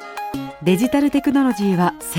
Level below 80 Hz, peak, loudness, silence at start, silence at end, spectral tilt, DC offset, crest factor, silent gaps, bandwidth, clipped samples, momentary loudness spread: -50 dBFS; -4 dBFS; -19 LUFS; 0 s; 0 s; -6 dB/octave; under 0.1%; 16 dB; none; 16.5 kHz; under 0.1%; 11 LU